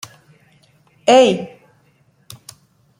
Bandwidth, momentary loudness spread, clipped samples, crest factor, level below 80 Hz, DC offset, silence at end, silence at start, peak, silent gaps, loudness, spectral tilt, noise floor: 15.5 kHz; 27 LU; under 0.1%; 18 dB; -66 dBFS; under 0.1%; 1.55 s; 1.05 s; -2 dBFS; none; -14 LUFS; -4 dB/octave; -57 dBFS